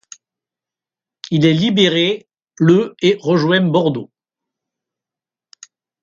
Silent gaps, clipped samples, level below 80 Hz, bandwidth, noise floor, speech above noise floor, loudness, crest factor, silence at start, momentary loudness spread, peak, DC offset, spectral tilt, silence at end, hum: none; under 0.1%; -60 dBFS; 7.4 kHz; -89 dBFS; 75 dB; -15 LUFS; 18 dB; 1.3 s; 9 LU; 0 dBFS; under 0.1%; -6 dB/octave; 2 s; none